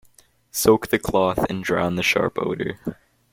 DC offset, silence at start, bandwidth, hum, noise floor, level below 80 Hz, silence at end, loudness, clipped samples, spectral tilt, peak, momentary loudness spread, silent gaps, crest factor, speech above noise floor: under 0.1%; 0.55 s; 16.5 kHz; none; -56 dBFS; -48 dBFS; 0.4 s; -21 LUFS; under 0.1%; -4.5 dB/octave; -4 dBFS; 11 LU; none; 18 dB; 35 dB